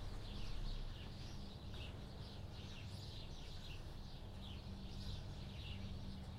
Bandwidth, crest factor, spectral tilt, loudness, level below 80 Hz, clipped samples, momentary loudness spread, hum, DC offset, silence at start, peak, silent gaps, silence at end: 15.5 kHz; 14 dB; -5.5 dB/octave; -52 LUFS; -52 dBFS; under 0.1%; 3 LU; none; under 0.1%; 0 s; -34 dBFS; none; 0 s